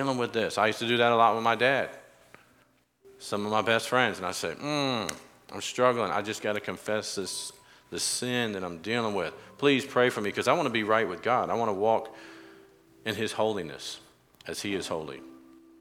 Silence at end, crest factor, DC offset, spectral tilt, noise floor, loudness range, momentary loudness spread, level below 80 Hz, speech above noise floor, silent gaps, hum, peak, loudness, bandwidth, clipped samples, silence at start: 0.4 s; 22 dB; under 0.1%; -3.5 dB/octave; -65 dBFS; 5 LU; 14 LU; -70 dBFS; 37 dB; none; none; -8 dBFS; -28 LUFS; 16.5 kHz; under 0.1%; 0 s